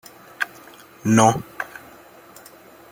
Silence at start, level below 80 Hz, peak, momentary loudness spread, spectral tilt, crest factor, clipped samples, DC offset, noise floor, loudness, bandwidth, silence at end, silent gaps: 0.4 s; -58 dBFS; -2 dBFS; 28 LU; -5 dB/octave; 22 dB; under 0.1%; under 0.1%; -46 dBFS; -21 LUFS; 17 kHz; 1.25 s; none